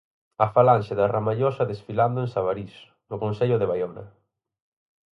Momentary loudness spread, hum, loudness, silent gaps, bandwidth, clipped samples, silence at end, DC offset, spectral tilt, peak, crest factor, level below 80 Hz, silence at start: 14 LU; none; -24 LUFS; none; 6.2 kHz; under 0.1%; 1.1 s; under 0.1%; -9 dB/octave; -4 dBFS; 20 dB; -58 dBFS; 0.4 s